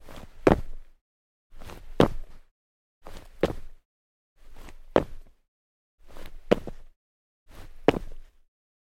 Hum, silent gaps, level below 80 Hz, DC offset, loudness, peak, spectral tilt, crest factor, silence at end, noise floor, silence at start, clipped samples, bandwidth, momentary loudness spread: none; 1.01-1.50 s, 2.51-3.01 s, 3.85-4.36 s, 5.48-5.98 s, 6.96-7.46 s; -42 dBFS; under 0.1%; -27 LUFS; 0 dBFS; -7 dB/octave; 30 dB; 0.7 s; under -90 dBFS; 0 s; under 0.1%; 16 kHz; 25 LU